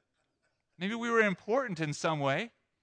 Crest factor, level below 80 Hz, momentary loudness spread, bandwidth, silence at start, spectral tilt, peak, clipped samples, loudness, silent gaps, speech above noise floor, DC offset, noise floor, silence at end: 20 dB; -78 dBFS; 10 LU; 10 kHz; 0.8 s; -5 dB/octave; -14 dBFS; under 0.1%; -31 LUFS; none; 48 dB; under 0.1%; -79 dBFS; 0.35 s